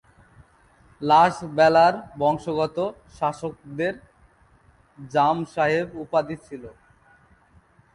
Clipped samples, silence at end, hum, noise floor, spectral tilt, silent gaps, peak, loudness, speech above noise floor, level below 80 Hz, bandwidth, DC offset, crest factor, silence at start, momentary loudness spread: under 0.1%; 1.25 s; none; -57 dBFS; -6 dB/octave; none; -4 dBFS; -22 LUFS; 35 dB; -58 dBFS; 11.5 kHz; under 0.1%; 20 dB; 1 s; 17 LU